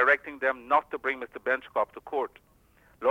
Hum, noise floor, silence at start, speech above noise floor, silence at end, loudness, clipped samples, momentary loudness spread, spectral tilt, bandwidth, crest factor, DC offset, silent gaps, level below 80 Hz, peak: none; -61 dBFS; 0 s; 32 dB; 0 s; -29 LUFS; under 0.1%; 8 LU; -4.5 dB/octave; 16 kHz; 18 dB; under 0.1%; none; -66 dBFS; -10 dBFS